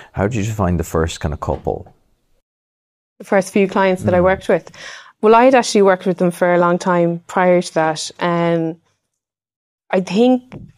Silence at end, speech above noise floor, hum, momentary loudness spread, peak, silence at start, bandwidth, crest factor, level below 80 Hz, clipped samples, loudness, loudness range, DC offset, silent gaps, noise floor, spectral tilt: 0.1 s; 65 dB; none; 10 LU; 0 dBFS; 0 s; 15.5 kHz; 16 dB; -40 dBFS; under 0.1%; -16 LUFS; 7 LU; under 0.1%; 2.42-3.16 s, 9.56-9.78 s; -80 dBFS; -6 dB/octave